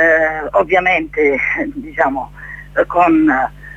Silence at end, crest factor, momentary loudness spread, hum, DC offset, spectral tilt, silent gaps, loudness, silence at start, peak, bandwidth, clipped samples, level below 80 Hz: 0 s; 14 dB; 11 LU; 50 Hz at -40 dBFS; under 0.1%; -6.5 dB/octave; none; -15 LUFS; 0 s; 0 dBFS; 7.8 kHz; under 0.1%; -40 dBFS